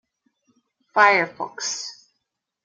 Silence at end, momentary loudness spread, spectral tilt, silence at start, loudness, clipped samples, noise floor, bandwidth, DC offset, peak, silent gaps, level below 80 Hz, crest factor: 0.7 s; 14 LU; -1.5 dB/octave; 0.95 s; -20 LUFS; under 0.1%; -79 dBFS; 10 kHz; under 0.1%; -2 dBFS; none; -80 dBFS; 22 dB